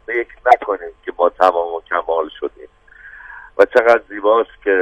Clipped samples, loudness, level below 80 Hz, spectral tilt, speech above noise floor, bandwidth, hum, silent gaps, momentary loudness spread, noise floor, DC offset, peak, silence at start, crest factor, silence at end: 0.3%; -16 LUFS; -52 dBFS; -4.5 dB/octave; 27 dB; 9.4 kHz; none; none; 17 LU; -42 dBFS; under 0.1%; 0 dBFS; 0.1 s; 18 dB; 0 s